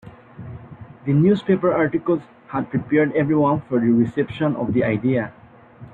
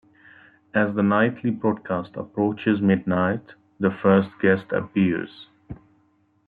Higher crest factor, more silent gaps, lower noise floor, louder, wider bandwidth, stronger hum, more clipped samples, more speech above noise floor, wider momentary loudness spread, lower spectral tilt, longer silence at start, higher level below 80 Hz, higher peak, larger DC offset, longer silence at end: about the same, 16 dB vs 20 dB; neither; second, -43 dBFS vs -63 dBFS; first, -20 LUFS vs -23 LUFS; about the same, 4.5 kHz vs 4.4 kHz; neither; neither; second, 24 dB vs 41 dB; about the same, 15 LU vs 13 LU; about the same, -10 dB/octave vs -10.5 dB/octave; second, 0.05 s vs 0.75 s; first, -54 dBFS vs -60 dBFS; about the same, -6 dBFS vs -4 dBFS; neither; second, 0.05 s vs 0.7 s